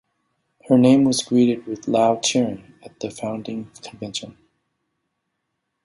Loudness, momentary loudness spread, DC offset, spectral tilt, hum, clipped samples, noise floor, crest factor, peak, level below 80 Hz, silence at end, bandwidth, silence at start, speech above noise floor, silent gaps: -19 LUFS; 18 LU; under 0.1%; -5 dB/octave; none; under 0.1%; -77 dBFS; 18 dB; -2 dBFS; -62 dBFS; 1.55 s; 11.5 kHz; 0.7 s; 57 dB; none